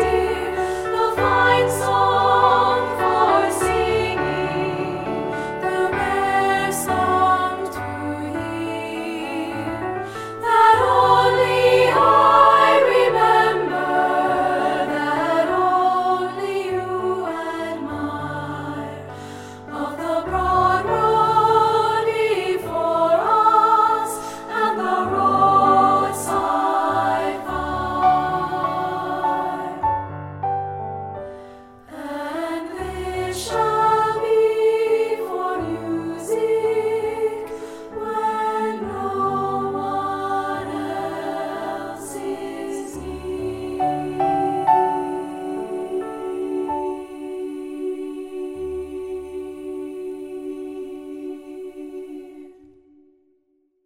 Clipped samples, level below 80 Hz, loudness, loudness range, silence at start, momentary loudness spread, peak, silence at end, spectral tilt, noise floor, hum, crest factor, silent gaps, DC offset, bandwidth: under 0.1%; -46 dBFS; -20 LUFS; 13 LU; 0 s; 16 LU; 0 dBFS; 1.35 s; -5 dB/octave; -66 dBFS; none; 20 dB; none; under 0.1%; 16 kHz